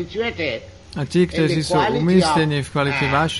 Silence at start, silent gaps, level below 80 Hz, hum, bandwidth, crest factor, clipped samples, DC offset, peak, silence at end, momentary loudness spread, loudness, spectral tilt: 0 s; none; -42 dBFS; none; 11.5 kHz; 16 dB; under 0.1%; 0.2%; -4 dBFS; 0 s; 10 LU; -19 LUFS; -5.5 dB/octave